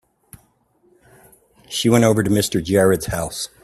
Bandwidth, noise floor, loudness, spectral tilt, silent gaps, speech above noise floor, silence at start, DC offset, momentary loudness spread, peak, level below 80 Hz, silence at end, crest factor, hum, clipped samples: 16 kHz; -60 dBFS; -18 LUFS; -5 dB/octave; none; 42 dB; 1.7 s; under 0.1%; 10 LU; 0 dBFS; -46 dBFS; 0.2 s; 20 dB; none; under 0.1%